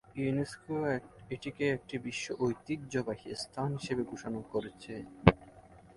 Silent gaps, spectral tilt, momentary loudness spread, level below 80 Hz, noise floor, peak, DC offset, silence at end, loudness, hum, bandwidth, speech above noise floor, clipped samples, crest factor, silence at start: none; -6 dB/octave; 14 LU; -52 dBFS; -56 dBFS; 0 dBFS; under 0.1%; 0.15 s; -34 LUFS; none; 11.5 kHz; 22 dB; under 0.1%; 34 dB; 0.1 s